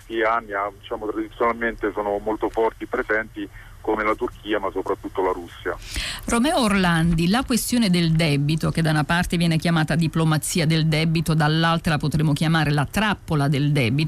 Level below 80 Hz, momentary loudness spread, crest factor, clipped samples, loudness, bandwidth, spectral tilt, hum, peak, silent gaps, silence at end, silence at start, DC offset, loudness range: -40 dBFS; 9 LU; 12 dB; under 0.1%; -22 LUFS; 15.5 kHz; -5.5 dB/octave; none; -10 dBFS; none; 0 s; 0.1 s; under 0.1%; 5 LU